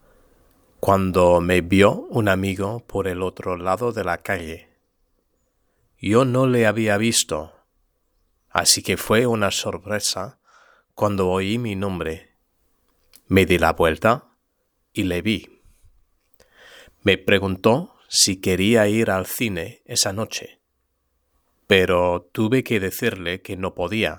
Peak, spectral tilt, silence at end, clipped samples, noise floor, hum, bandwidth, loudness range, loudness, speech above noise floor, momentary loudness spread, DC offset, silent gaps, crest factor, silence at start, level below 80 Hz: 0 dBFS; -4 dB/octave; 0 s; under 0.1%; -72 dBFS; none; over 20 kHz; 6 LU; -20 LUFS; 52 dB; 11 LU; under 0.1%; none; 22 dB; 0.85 s; -48 dBFS